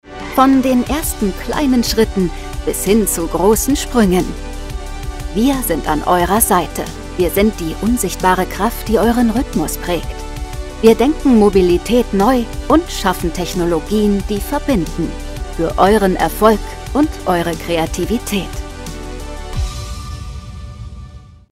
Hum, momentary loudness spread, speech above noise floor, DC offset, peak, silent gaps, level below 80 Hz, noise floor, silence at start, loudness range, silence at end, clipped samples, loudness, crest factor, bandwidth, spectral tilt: none; 16 LU; 22 dB; under 0.1%; 0 dBFS; none; -26 dBFS; -36 dBFS; 0.05 s; 6 LU; 0.15 s; under 0.1%; -15 LUFS; 16 dB; 16.5 kHz; -5 dB/octave